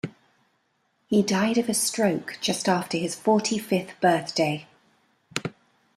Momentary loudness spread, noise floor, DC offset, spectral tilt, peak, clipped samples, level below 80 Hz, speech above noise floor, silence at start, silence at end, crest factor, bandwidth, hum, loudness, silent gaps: 10 LU; -70 dBFS; under 0.1%; -4 dB/octave; -4 dBFS; under 0.1%; -68 dBFS; 47 dB; 0.05 s; 0.45 s; 22 dB; 14.5 kHz; none; -25 LUFS; none